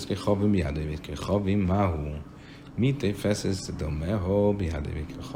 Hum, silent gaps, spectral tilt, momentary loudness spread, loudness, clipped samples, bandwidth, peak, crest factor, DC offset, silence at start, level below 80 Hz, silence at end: none; none; -7 dB/octave; 12 LU; -28 LUFS; under 0.1%; 16 kHz; -10 dBFS; 16 dB; under 0.1%; 0 s; -42 dBFS; 0 s